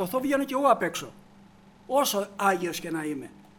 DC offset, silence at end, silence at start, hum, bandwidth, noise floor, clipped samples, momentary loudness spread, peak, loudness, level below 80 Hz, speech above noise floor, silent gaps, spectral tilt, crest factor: under 0.1%; 0.2 s; 0 s; none; over 20 kHz; -54 dBFS; under 0.1%; 12 LU; -8 dBFS; -27 LUFS; -64 dBFS; 27 dB; none; -3.5 dB/octave; 20 dB